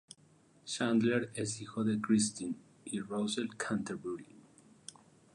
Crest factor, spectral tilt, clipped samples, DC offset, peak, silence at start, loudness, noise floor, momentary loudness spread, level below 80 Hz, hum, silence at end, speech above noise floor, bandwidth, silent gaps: 18 dB; -4.5 dB/octave; under 0.1%; under 0.1%; -18 dBFS; 0.65 s; -35 LUFS; -65 dBFS; 21 LU; -74 dBFS; none; 0.95 s; 31 dB; 11.5 kHz; none